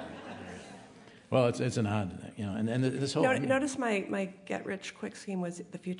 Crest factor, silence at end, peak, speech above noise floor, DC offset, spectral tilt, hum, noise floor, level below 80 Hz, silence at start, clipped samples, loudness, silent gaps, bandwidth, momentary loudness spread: 20 dB; 0 s; -12 dBFS; 22 dB; under 0.1%; -6 dB/octave; none; -54 dBFS; -70 dBFS; 0 s; under 0.1%; -32 LUFS; none; 11 kHz; 16 LU